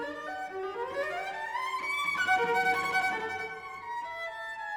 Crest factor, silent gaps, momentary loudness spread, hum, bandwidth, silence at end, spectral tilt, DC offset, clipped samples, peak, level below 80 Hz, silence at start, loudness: 16 dB; none; 11 LU; none; over 20 kHz; 0 s; -2.5 dB/octave; under 0.1%; under 0.1%; -16 dBFS; -70 dBFS; 0 s; -31 LUFS